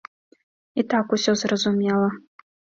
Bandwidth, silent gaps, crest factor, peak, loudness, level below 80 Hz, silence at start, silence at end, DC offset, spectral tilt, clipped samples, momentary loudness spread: 7.8 kHz; none; 18 dB; -6 dBFS; -22 LUFS; -64 dBFS; 0.75 s; 0.6 s; under 0.1%; -4.5 dB/octave; under 0.1%; 8 LU